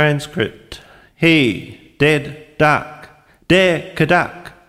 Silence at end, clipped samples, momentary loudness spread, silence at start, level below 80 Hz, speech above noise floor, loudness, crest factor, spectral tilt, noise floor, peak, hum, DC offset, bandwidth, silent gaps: 0.2 s; under 0.1%; 20 LU; 0 s; -46 dBFS; 28 dB; -16 LUFS; 16 dB; -5.5 dB/octave; -44 dBFS; -2 dBFS; none; under 0.1%; 15 kHz; none